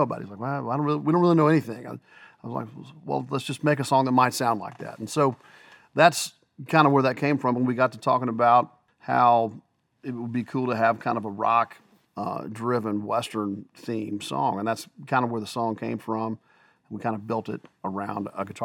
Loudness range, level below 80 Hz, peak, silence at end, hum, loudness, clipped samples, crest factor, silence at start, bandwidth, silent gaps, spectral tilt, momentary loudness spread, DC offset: 7 LU; -78 dBFS; -2 dBFS; 0 s; none; -25 LUFS; under 0.1%; 22 dB; 0 s; 18 kHz; none; -6 dB/octave; 17 LU; under 0.1%